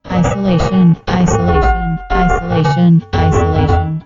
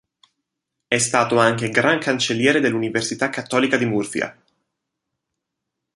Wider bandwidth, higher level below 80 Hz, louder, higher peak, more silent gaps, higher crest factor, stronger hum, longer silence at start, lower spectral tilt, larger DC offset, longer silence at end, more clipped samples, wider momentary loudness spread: second, 7.6 kHz vs 11.5 kHz; first, -22 dBFS vs -62 dBFS; first, -13 LUFS vs -19 LUFS; about the same, 0 dBFS vs -2 dBFS; neither; second, 12 dB vs 20 dB; neither; second, 0.05 s vs 0.9 s; first, -7 dB/octave vs -4 dB/octave; neither; second, 0.05 s vs 1.65 s; neither; about the same, 4 LU vs 6 LU